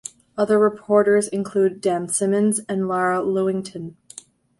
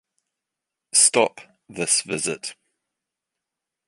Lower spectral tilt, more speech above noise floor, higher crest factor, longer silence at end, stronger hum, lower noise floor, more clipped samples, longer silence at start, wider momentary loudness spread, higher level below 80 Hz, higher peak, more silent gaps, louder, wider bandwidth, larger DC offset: first, -5 dB/octave vs -1 dB/octave; second, 25 dB vs 61 dB; second, 16 dB vs 24 dB; second, 0.7 s vs 1.35 s; neither; second, -45 dBFS vs -85 dBFS; neither; second, 0.35 s vs 0.95 s; about the same, 18 LU vs 18 LU; about the same, -64 dBFS vs -68 dBFS; about the same, -4 dBFS vs -2 dBFS; neither; about the same, -20 LUFS vs -19 LUFS; about the same, 11.5 kHz vs 11.5 kHz; neither